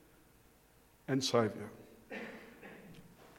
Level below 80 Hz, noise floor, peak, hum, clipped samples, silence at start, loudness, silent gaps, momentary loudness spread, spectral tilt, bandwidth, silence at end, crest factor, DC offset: -72 dBFS; -66 dBFS; -16 dBFS; none; under 0.1%; 1.1 s; -36 LUFS; none; 24 LU; -4.5 dB/octave; 16.5 kHz; 0.05 s; 24 dB; under 0.1%